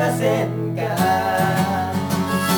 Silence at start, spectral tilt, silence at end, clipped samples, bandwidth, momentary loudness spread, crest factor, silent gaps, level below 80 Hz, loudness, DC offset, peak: 0 s; -5.5 dB/octave; 0 s; under 0.1%; 19 kHz; 4 LU; 14 dB; none; -54 dBFS; -20 LUFS; under 0.1%; -6 dBFS